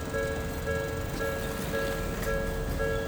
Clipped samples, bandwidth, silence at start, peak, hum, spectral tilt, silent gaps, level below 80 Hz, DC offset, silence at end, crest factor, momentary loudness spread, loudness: under 0.1%; over 20 kHz; 0 s; -18 dBFS; none; -5 dB/octave; none; -38 dBFS; under 0.1%; 0 s; 14 dB; 2 LU; -32 LUFS